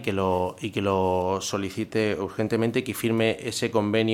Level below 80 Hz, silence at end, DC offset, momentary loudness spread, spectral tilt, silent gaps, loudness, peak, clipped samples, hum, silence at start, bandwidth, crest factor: -58 dBFS; 0 s; under 0.1%; 5 LU; -5 dB/octave; none; -26 LUFS; -8 dBFS; under 0.1%; none; 0 s; 16.5 kHz; 16 dB